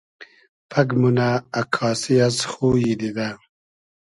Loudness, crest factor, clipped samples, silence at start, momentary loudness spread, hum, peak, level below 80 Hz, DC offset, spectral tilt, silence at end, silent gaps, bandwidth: -21 LUFS; 20 dB; under 0.1%; 0.2 s; 8 LU; none; -2 dBFS; -52 dBFS; under 0.1%; -5.5 dB/octave; 0.7 s; 0.49-0.69 s; 11.5 kHz